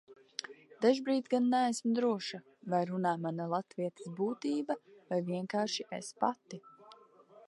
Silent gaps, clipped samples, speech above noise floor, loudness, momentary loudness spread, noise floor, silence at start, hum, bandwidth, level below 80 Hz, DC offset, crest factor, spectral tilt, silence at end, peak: none; under 0.1%; 27 dB; -34 LUFS; 13 LU; -60 dBFS; 0.1 s; none; 11.5 kHz; -88 dBFS; under 0.1%; 20 dB; -5.5 dB/octave; 0.1 s; -14 dBFS